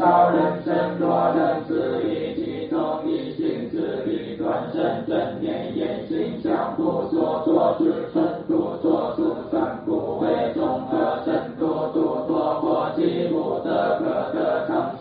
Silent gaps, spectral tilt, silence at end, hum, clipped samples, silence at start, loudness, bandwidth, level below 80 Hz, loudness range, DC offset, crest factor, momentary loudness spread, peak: none; -6 dB/octave; 0 s; none; under 0.1%; 0 s; -23 LUFS; 4.8 kHz; -58 dBFS; 3 LU; under 0.1%; 16 dB; 6 LU; -6 dBFS